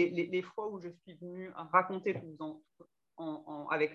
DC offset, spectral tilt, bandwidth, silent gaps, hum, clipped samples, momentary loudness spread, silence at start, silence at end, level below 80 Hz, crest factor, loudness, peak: under 0.1%; -7.5 dB/octave; 7 kHz; none; none; under 0.1%; 17 LU; 0 s; 0 s; -84 dBFS; 24 dB; -36 LUFS; -12 dBFS